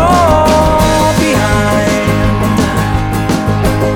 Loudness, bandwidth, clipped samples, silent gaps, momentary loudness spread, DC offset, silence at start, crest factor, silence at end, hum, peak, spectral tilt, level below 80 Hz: -11 LUFS; 19 kHz; under 0.1%; none; 5 LU; under 0.1%; 0 s; 10 dB; 0 s; none; 0 dBFS; -5.5 dB/octave; -22 dBFS